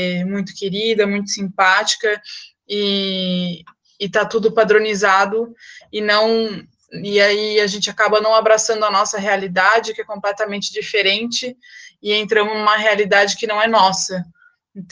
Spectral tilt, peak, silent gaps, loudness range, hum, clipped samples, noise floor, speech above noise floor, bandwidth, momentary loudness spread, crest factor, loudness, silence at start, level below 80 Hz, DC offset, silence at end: -3 dB/octave; 0 dBFS; none; 3 LU; none; under 0.1%; -38 dBFS; 21 dB; 10 kHz; 13 LU; 18 dB; -16 LUFS; 0 s; -64 dBFS; under 0.1%; 0.1 s